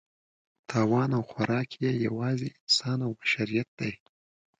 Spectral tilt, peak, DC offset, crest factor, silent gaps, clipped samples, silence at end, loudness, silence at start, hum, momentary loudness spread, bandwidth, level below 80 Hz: -5 dB/octave; -12 dBFS; under 0.1%; 18 dB; 2.60-2.67 s, 3.68-3.78 s; under 0.1%; 0.65 s; -28 LUFS; 0.7 s; none; 9 LU; 9.4 kHz; -66 dBFS